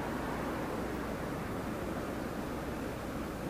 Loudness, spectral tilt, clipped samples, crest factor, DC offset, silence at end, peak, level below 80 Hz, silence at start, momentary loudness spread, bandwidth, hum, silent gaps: -38 LUFS; -6 dB/octave; under 0.1%; 12 dB; under 0.1%; 0 s; -26 dBFS; -50 dBFS; 0 s; 2 LU; 15.5 kHz; none; none